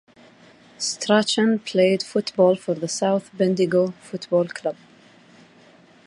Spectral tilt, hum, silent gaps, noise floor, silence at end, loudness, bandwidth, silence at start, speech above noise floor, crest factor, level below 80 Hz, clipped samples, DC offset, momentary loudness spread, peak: -4.5 dB/octave; none; none; -52 dBFS; 1.35 s; -21 LUFS; 11.5 kHz; 0.8 s; 31 dB; 18 dB; -72 dBFS; under 0.1%; under 0.1%; 9 LU; -4 dBFS